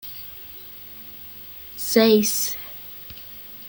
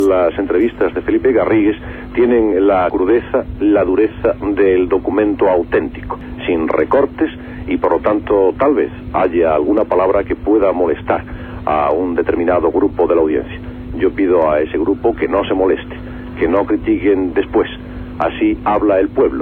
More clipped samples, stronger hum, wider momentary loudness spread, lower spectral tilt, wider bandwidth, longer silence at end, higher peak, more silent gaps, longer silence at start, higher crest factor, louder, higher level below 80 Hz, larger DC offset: neither; neither; first, 20 LU vs 8 LU; second, -3 dB/octave vs -8.5 dB/octave; first, 17 kHz vs 4.3 kHz; about the same, 0 s vs 0 s; about the same, -4 dBFS vs -2 dBFS; neither; about the same, 0.05 s vs 0 s; first, 22 dB vs 12 dB; second, -20 LUFS vs -15 LUFS; second, -58 dBFS vs -36 dBFS; neither